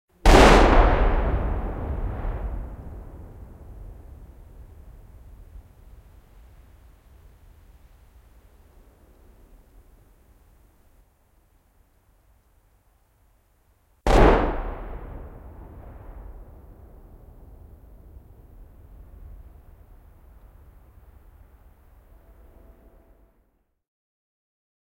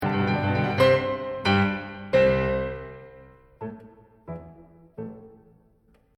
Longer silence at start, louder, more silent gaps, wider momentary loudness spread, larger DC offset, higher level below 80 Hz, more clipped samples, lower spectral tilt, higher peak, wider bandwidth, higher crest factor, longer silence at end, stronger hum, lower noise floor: first, 0.25 s vs 0 s; about the same, -21 LUFS vs -23 LUFS; neither; first, 31 LU vs 20 LU; neither; first, -30 dBFS vs -48 dBFS; neither; second, -5.5 dB/octave vs -7 dB/octave; first, 0 dBFS vs -8 dBFS; about the same, 13.5 kHz vs 13 kHz; first, 26 dB vs 18 dB; first, 8.5 s vs 0.9 s; neither; first, -67 dBFS vs -61 dBFS